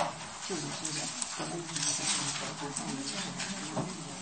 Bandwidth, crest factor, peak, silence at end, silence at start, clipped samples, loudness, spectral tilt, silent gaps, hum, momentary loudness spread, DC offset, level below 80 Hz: 8.8 kHz; 22 dB; -14 dBFS; 0 s; 0 s; under 0.1%; -34 LUFS; -2 dB/octave; none; none; 7 LU; under 0.1%; -66 dBFS